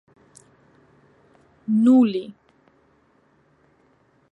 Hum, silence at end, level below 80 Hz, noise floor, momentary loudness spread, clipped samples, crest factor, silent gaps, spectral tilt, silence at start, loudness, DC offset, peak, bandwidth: none; 2 s; -74 dBFS; -61 dBFS; 22 LU; under 0.1%; 18 dB; none; -7.5 dB/octave; 1.7 s; -19 LUFS; under 0.1%; -8 dBFS; 8.8 kHz